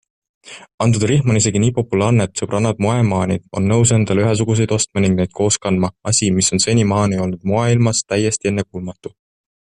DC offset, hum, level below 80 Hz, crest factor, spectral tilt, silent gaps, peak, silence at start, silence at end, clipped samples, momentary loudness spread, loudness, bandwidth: under 0.1%; none; -46 dBFS; 14 dB; -5 dB/octave; 0.74-0.78 s; -2 dBFS; 0.45 s; 0.55 s; under 0.1%; 6 LU; -16 LUFS; 11 kHz